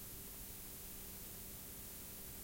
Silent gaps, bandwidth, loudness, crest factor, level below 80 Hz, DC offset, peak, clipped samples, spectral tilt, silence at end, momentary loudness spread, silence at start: none; 16.5 kHz; -49 LUFS; 14 dB; -60 dBFS; under 0.1%; -38 dBFS; under 0.1%; -2.5 dB/octave; 0 s; 0 LU; 0 s